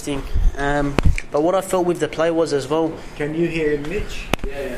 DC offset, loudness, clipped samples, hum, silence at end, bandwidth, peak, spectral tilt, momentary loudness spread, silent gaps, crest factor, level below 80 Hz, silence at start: under 0.1%; -21 LUFS; under 0.1%; none; 0 s; 14 kHz; 0 dBFS; -6 dB/octave; 7 LU; none; 20 dB; -26 dBFS; 0 s